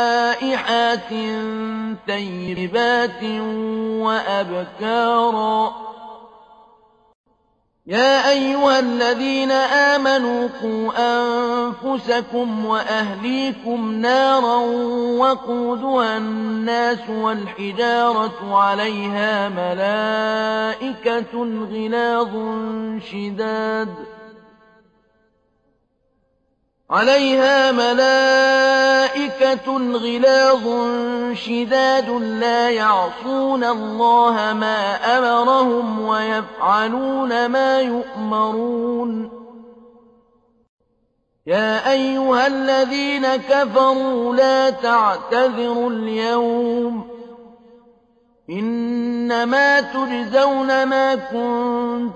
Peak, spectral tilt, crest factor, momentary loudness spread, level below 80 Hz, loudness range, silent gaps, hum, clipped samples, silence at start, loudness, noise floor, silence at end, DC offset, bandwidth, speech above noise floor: -4 dBFS; -4.5 dB/octave; 16 dB; 10 LU; -60 dBFS; 7 LU; 7.15-7.24 s, 40.69-40.78 s; none; under 0.1%; 0 s; -18 LUFS; -66 dBFS; 0 s; under 0.1%; 8.6 kHz; 48 dB